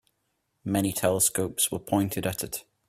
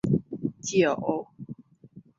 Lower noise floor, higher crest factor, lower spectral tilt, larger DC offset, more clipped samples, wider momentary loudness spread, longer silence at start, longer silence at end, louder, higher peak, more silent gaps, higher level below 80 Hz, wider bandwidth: first, -76 dBFS vs -52 dBFS; about the same, 20 dB vs 20 dB; second, -4 dB/octave vs -5.5 dB/octave; neither; neither; second, 10 LU vs 20 LU; first, 0.65 s vs 0.05 s; about the same, 0.25 s vs 0.2 s; about the same, -26 LUFS vs -27 LUFS; about the same, -8 dBFS vs -8 dBFS; neither; about the same, -58 dBFS vs -60 dBFS; first, 16 kHz vs 7.8 kHz